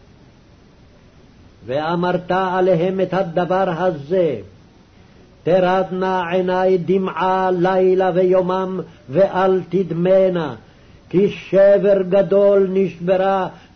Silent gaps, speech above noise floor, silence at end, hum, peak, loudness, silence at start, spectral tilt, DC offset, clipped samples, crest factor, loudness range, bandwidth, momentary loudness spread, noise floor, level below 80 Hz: none; 31 dB; 0.15 s; none; -6 dBFS; -17 LUFS; 1.65 s; -8 dB/octave; under 0.1%; under 0.1%; 12 dB; 4 LU; 6.4 kHz; 8 LU; -48 dBFS; -52 dBFS